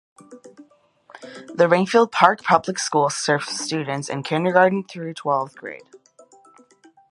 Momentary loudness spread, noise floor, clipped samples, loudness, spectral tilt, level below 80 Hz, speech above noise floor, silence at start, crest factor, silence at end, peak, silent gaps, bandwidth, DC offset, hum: 19 LU; -55 dBFS; under 0.1%; -20 LUFS; -4 dB/octave; -72 dBFS; 34 dB; 0.3 s; 22 dB; 1.35 s; 0 dBFS; none; 11.5 kHz; under 0.1%; none